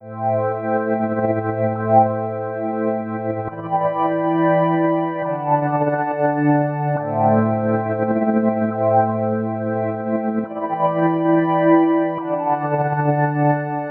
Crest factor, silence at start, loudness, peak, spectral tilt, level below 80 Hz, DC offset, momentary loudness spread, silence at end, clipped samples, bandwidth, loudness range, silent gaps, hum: 18 dB; 0 s; -19 LUFS; -2 dBFS; -12.5 dB/octave; -62 dBFS; under 0.1%; 7 LU; 0 s; under 0.1%; 3.9 kHz; 2 LU; none; none